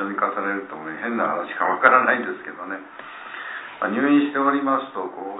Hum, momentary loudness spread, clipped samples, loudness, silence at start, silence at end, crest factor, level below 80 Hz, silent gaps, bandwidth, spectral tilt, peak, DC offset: none; 17 LU; under 0.1%; -21 LUFS; 0 s; 0 s; 22 dB; -74 dBFS; none; 4 kHz; -9 dB/octave; 0 dBFS; under 0.1%